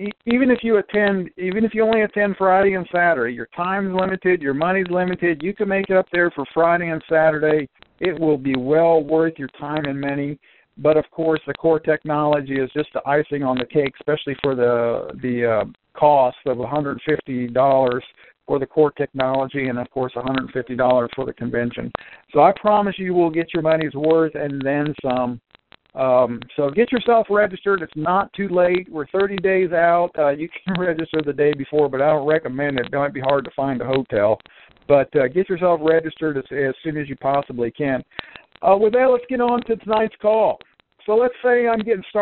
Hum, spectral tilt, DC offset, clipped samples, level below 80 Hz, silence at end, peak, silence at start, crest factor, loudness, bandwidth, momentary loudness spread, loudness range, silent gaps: none; -5 dB/octave; under 0.1%; under 0.1%; -54 dBFS; 0 s; 0 dBFS; 0 s; 18 dB; -20 LUFS; 4.3 kHz; 8 LU; 2 LU; none